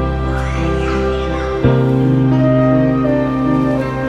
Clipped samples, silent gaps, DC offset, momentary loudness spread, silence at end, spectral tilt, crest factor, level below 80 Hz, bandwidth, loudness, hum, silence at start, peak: under 0.1%; none; under 0.1%; 6 LU; 0 s; -8.5 dB/octave; 14 dB; -26 dBFS; 7.8 kHz; -15 LUFS; none; 0 s; 0 dBFS